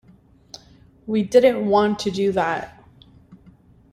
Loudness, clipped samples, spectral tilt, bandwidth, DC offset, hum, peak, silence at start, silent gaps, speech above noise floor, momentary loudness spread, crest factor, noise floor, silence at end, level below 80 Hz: -20 LUFS; under 0.1%; -5.5 dB/octave; 14 kHz; under 0.1%; none; -2 dBFS; 1.05 s; none; 34 dB; 26 LU; 20 dB; -52 dBFS; 0.55 s; -56 dBFS